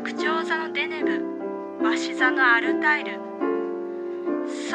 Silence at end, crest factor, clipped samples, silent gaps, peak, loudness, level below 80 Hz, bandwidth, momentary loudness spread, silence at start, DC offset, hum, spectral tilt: 0 s; 18 dB; under 0.1%; none; -6 dBFS; -24 LUFS; -82 dBFS; 9.6 kHz; 12 LU; 0 s; under 0.1%; none; -3.5 dB/octave